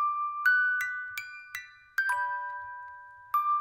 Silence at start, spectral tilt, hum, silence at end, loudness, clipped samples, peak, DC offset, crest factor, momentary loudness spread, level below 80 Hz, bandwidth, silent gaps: 0 s; 1.5 dB/octave; none; 0 s; -29 LUFS; under 0.1%; -14 dBFS; under 0.1%; 16 dB; 17 LU; -78 dBFS; 16 kHz; none